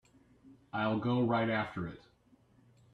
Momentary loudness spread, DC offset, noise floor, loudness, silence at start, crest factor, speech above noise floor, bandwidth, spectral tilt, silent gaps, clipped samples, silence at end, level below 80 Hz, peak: 13 LU; under 0.1%; -66 dBFS; -34 LUFS; 0.45 s; 16 dB; 34 dB; 7.6 kHz; -8.5 dB/octave; none; under 0.1%; 0.95 s; -68 dBFS; -20 dBFS